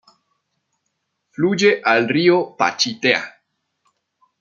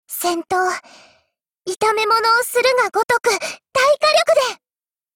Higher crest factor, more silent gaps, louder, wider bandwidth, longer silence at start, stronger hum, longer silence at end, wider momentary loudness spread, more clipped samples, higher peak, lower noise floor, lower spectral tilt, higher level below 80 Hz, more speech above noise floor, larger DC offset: first, 20 dB vs 14 dB; second, none vs 3.05-3.09 s; about the same, -17 LUFS vs -17 LUFS; second, 7.4 kHz vs 17 kHz; first, 1.4 s vs 0.1 s; neither; first, 1.1 s vs 0.6 s; about the same, 7 LU vs 9 LU; neither; about the same, -2 dBFS vs -4 dBFS; second, -74 dBFS vs under -90 dBFS; first, -4 dB/octave vs -1 dB/octave; second, -70 dBFS vs -62 dBFS; second, 57 dB vs over 73 dB; neither